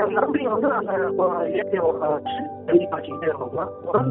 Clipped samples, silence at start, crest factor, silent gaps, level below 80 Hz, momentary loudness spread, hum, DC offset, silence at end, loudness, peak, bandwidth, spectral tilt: under 0.1%; 0 s; 18 dB; none; -62 dBFS; 8 LU; none; under 0.1%; 0 s; -23 LUFS; -4 dBFS; 4 kHz; -5.5 dB/octave